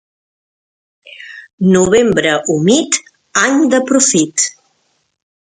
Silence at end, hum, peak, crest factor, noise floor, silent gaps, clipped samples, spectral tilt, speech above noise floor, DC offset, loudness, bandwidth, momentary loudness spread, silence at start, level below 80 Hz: 0.95 s; none; 0 dBFS; 14 dB; -63 dBFS; 1.53-1.58 s; under 0.1%; -3.5 dB/octave; 51 dB; under 0.1%; -12 LUFS; 9.6 kHz; 15 LU; 1.2 s; -50 dBFS